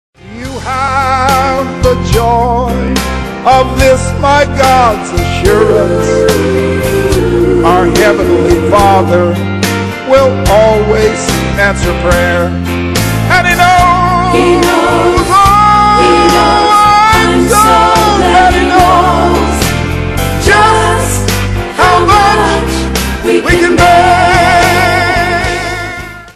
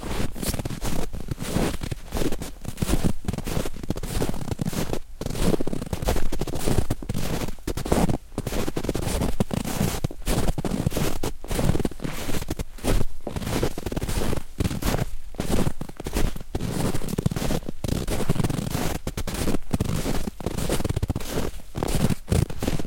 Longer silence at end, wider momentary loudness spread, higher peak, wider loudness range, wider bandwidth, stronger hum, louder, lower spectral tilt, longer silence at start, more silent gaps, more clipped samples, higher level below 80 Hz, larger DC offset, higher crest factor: about the same, 0.05 s vs 0 s; about the same, 8 LU vs 6 LU; about the same, 0 dBFS vs -2 dBFS; about the same, 3 LU vs 2 LU; second, 14.5 kHz vs 17 kHz; neither; first, -8 LUFS vs -28 LUFS; about the same, -5 dB/octave vs -5.5 dB/octave; first, 0.25 s vs 0 s; neither; first, 1% vs under 0.1%; first, -22 dBFS vs -30 dBFS; second, under 0.1% vs 0.2%; second, 8 dB vs 22 dB